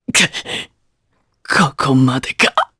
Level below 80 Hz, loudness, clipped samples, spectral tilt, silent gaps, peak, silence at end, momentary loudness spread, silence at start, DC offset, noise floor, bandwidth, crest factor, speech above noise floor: -50 dBFS; -15 LUFS; under 0.1%; -3.5 dB/octave; none; 0 dBFS; 0.15 s; 12 LU; 0.1 s; under 0.1%; -64 dBFS; 11 kHz; 18 dB; 49 dB